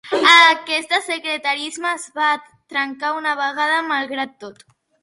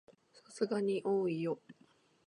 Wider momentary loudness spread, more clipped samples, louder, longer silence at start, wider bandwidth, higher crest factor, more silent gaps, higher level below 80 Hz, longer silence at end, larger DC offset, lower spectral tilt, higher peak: first, 15 LU vs 10 LU; neither; first, -17 LUFS vs -36 LUFS; about the same, 0.05 s vs 0.1 s; about the same, 11.5 kHz vs 11 kHz; about the same, 20 dB vs 18 dB; neither; first, -70 dBFS vs -84 dBFS; about the same, 0.5 s vs 0.55 s; neither; second, -0.5 dB/octave vs -6.5 dB/octave; first, 0 dBFS vs -20 dBFS